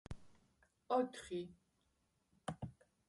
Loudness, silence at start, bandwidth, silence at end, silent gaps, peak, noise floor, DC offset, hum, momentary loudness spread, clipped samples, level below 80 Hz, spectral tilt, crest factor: -44 LUFS; 0.1 s; 11.5 kHz; 0.35 s; none; -24 dBFS; -81 dBFS; under 0.1%; none; 17 LU; under 0.1%; -66 dBFS; -6 dB/octave; 22 dB